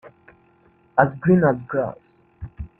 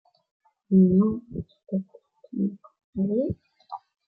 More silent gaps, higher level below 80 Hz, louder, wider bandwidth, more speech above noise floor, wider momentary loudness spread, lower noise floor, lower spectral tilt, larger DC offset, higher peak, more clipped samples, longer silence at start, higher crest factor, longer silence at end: second, none vs 2.84-2.93 s; first, -48 dBFS vs -58 dBFS; first, -20 LUFS vs -25 LUFS; first, 3 kHz vs 1.3 kHz; first, 38 dB vs 20 dB; about the same, 22 LU vs 23 LU; first, -57 dBFS vs -43 dBFS; second, -11.5 dB/octave vs -14 dB/octave; neither; first, 0 dBFS vs -10 dBFS; neither; second, 0.05 s vs 0.7 s; about the same, 22 dB vs 18 dB; second, 0.15 s vs 0.3 s